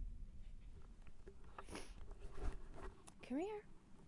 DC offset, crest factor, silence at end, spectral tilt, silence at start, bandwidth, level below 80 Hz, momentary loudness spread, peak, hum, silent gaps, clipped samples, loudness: under 0.1%; 20 dB; 0 s; -6 dB/octave; 0 s; 11.5 kHz; -54 dBFS; 17 LU; -30 dBFS; none; none; under 0.1%; -54 LUFS